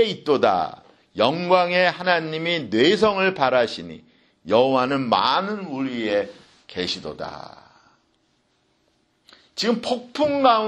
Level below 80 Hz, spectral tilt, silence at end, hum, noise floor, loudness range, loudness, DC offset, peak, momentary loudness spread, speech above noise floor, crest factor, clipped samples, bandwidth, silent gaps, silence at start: -62 dBFS; -5 dB/octave; 0 s; none; -66 dBFS; 11 LU; -21 LUFS; under 0.1%; -2 dBFS; 16 LU; 45 dB; 20 dB; under 0.1%; 10 kHz; none; 0 s